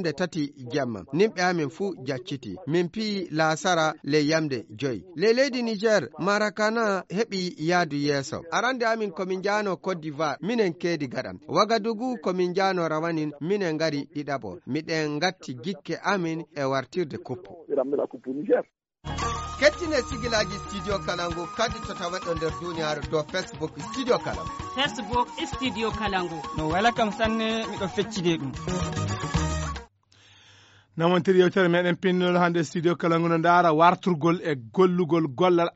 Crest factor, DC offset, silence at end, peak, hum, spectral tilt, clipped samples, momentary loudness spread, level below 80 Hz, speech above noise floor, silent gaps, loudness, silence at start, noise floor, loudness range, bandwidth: 20 dB; under 0.1%; 0.05 s; -6 dBFS; none; -4 dB/octave; under 0.1%; 10 LU; -48 dBFS; 32 dB; none; -26 LUFS; 0 s; -58 dBFS; 7 LU; 8 kHz